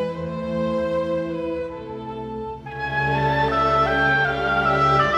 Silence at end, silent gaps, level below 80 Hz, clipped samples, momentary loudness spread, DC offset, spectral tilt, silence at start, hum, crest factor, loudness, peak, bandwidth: 0 s; none; -42 dBFS; under 0.1%; 13 LU; under 0.1%; -6.5 dB/octave; 0 s; none; 16 dB; -22 LUFS; -6 dBFS; 9.6 kHz